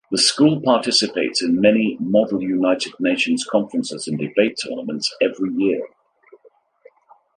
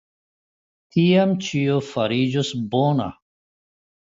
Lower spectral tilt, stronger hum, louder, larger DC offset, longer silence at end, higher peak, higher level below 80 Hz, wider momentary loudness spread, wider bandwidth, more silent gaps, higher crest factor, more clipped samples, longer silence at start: second, -4 dB/octave vs -6.5 dB/octave; neither; about the same, -19 LUFS vs -21 LUFS; neither; first, 1.5 s vs 1 s; first, 0 dBFS vs -6 dBFS; second, -64 dBFS vs -58 dBFS; about the same, 9 LU vs 8 LU; first, 11.5 kHz vs 7.8 kHz; neither; about the same, 20 dB vs 16 dB; neither; second, 0.1 s vs 0.95 s